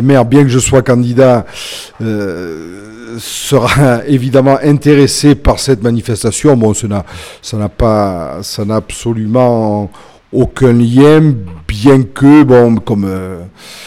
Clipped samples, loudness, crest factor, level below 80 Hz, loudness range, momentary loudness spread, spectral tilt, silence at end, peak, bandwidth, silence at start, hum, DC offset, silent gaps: 1%; -10 LUFS; 10 dB; -30 dBFS; 5 LU; 16 LU; -6 dB/octave; 0 s; 0 dBFS; 15.5 kHz; 0 s; none; under 0.1%; none